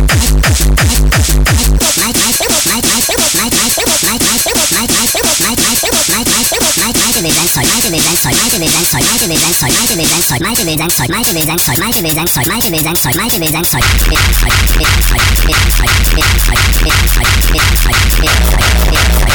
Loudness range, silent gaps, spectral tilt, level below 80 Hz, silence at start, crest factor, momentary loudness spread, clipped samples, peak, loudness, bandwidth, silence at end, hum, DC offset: 1 LU; none; -2.5 dB/octave; -14 dBFS; 0 s; 8 dB; 2 LU; under 0.1%; -2 dBFS; -9 LUFS; over 20 kHz; 0 s; none; under 0.1%